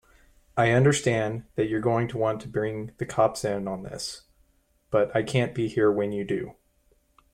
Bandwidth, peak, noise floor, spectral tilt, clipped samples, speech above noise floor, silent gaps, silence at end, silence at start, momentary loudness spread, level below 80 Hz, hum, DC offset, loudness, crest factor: 15 kHz; -8 dBFS; -66 dBFS; -6 dB/octave; under 0.1%; 41 dB; none; 0.8 s; 0.55 s; 12 LU; -56 dBFS; none; under 0.1%; -26 LUFS; 18 dB